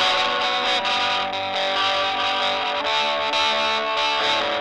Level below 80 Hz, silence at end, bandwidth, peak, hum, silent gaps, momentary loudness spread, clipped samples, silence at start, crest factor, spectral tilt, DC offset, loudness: -60 dBFS; 0 s; 11.5 kHz; -6 dBFS; none; none; 3 LU; under 0.1%; 0 s; 16 dB; -1 dB/octave; under 0.1%; -20 LUFS